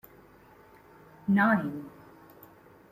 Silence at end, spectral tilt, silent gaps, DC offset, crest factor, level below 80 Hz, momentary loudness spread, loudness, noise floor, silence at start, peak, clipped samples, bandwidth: 1.05 s; -8.5 dB/octave; none; under 0.1%; 20 dB; -70 dBFS; 20 LU; -27 LUFS; -56 dBFS; 1.25 s; -12 dBFS; under 0.1%; 15.5 kHz